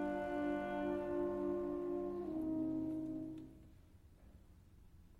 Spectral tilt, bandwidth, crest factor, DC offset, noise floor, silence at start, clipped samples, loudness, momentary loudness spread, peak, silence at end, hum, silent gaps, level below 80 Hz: -8 dB/octave; 7.6 kHz; 12 dB; under 0.1%; -62 dBFS; 0 s; under 0.1%; -41 LUFS; 9 LU; -30 dBFS; 0 s; none; none; -64 dBFS